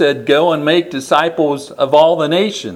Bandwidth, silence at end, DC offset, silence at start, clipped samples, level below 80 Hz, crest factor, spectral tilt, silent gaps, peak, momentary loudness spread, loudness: 15 kHz; 0 s; under 0.1%; 0 s; under 0.1%; -60 dBFS; 14 dB; -5 dB/octave; none; 0 dBFS; 6 LU; -13 LUFS